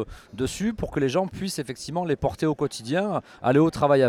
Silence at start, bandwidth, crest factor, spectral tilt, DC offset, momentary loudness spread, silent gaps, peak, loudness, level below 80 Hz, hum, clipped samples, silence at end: 0 s; 15.5 kHz; 16 dB; -6 dB/octave; under 0.1%; 10 LU; none; -8 dBFS; -25 LUFS; -48 dBFS; none; under 0.1%; 0 s